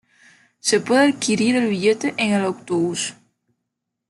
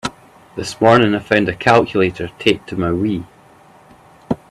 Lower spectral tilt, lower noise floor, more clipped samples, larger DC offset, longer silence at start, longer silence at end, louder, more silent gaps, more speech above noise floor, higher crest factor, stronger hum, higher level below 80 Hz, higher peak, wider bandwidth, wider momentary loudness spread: second, -4 dB/octave vs -6 dB/octave; first, -79 dBFS vs -46 dBFS; neither; neither; first, 0.65 s vs 0.05 s; first, 0.95 s vs 0.15 s; second, -20 LUFS vs -16 LUFS; neither; first, 60 dB vs 31 dB; about the same, 16 dB vs 18 dB; neither; second, -66 dBFS vs -48 dBFS; second, -6 dBFS vs 0 dBFS; second, 12 kHz vs 13.5 kHz; second, 7 LU vs 15 LU